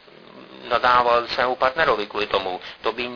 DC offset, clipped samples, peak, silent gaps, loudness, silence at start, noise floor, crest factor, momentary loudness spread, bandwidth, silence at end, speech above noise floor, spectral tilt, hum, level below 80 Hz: under 0.1%; under 0.1%; -4 dBFS; none; -21 LUFS; 0.35 s; -45 dBFS; 18 dB; 11 LU; 5.4 kHz; 0 s; 24 dB; -4.5 dB/octave; none; -52 dBFS